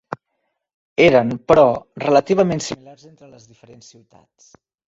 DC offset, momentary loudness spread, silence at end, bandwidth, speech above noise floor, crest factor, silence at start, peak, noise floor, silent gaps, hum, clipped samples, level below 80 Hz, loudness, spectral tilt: under 0.1%; 19 LU; 2.15 s; 8 kHz; 56 dB; 18 dB; 0.1 s; -2 dBFS; -74 dBFS; 0.74-0.96 s; none; under 0.1%; -50 dBFS; -16 LUFS; -5.5 dB/octave